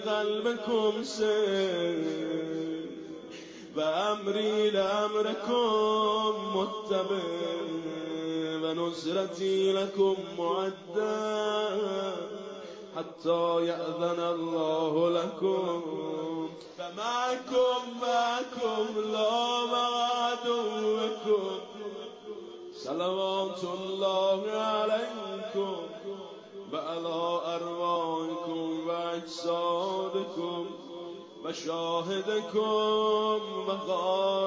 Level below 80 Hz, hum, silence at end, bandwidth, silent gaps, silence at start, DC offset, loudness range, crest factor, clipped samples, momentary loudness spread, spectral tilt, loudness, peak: -76 dBFS; none; 0 s; 7.8 kHz; none; 0 s; under 0.1%; 4 LU; 14 dB; under 0.1%; 13 LU; -4.5 dB/octave; -30 LUFS; -16 dBFS